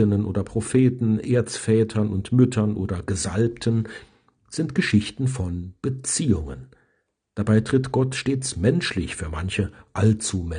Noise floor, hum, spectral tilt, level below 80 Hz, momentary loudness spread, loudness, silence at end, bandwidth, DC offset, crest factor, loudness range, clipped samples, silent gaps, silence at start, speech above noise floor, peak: -71 dBFS; none; -6 dB/octave; -46 dBFS; 10 LU; -23 LUFS; 0 s; 10 kHz; under 0.1%; 18 dB; 3 LU; under 0.1%; none; 0 s; 49 dB; -4 dBFS